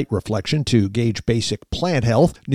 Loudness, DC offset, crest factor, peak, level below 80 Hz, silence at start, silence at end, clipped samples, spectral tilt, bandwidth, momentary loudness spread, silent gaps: -20 LUFS; 0.5%; 14 dB; -4 dBFS; -40 dBFS; 0 s; 0 s; under 0.1%; -6 dB/octave; 13.5 kHz; 6 LU; none